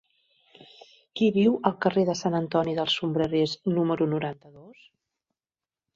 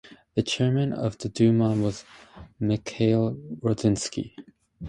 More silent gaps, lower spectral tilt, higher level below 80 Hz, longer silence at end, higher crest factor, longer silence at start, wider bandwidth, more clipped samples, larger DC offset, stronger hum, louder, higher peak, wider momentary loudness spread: neither; about the same, -6 dB/octave vs -6.5 dB/octave; second, -64 dBFS vs -52 dBFS; first, 1.25 s vs 0 s; first, 22 dB vs 16 dB; first, 1.15 s vs 0.1 s; second, 7.8 kHz vs 11 kHz; neither; neither; neither; about the same, -25 LUFS vs -25 LUFS; first, -4 dBFS vs -10 dBFS; second, 7 LU vs 10 LU